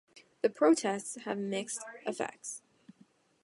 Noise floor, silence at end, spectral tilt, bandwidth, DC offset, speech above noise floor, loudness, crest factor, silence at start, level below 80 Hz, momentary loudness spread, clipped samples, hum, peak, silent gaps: -66 dBFS; 0.85 s; -4 dB/octave; 11.5 kHz; under 0.1%; 33 dB; -33 LUFS; 20 dB; 0.15 s; -84 dBFS; 15 LU; under 0.1%; none; -14 dBFS; none